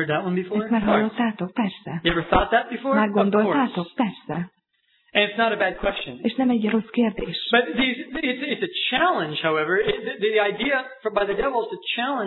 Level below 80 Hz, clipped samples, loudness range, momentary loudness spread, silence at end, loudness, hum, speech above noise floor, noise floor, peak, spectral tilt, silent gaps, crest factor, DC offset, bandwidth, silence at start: -46 dBFS; under 0.1%; 2 LU; 7 LU; 0 s; -23 LUFS; none; 44 dB; -67 dBFS; -4 dBFS; -8.5 dB/octave; none; 18 dB; under 0.1%; 4.3 kHz; 0 s